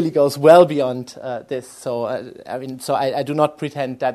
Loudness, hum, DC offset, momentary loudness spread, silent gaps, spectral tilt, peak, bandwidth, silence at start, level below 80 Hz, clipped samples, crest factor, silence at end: -18 LUFS; none; under 0.1%; 18 LU; none; -6 dB/octave; 0 dBFS; 13.5 kHz; 0 s; -64 dBFS; under 0.1%; 18 dB; 0 s